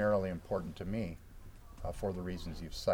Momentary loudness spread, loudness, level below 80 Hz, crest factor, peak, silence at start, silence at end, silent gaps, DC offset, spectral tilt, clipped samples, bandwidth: 19 LU; -39 LUFS; -50 dBFS; 18 dB; -18 dBFS; 0 s; 0 s; none; under 0.1%; -6.5 dB/octave; under 0.1%; 17.5 kHz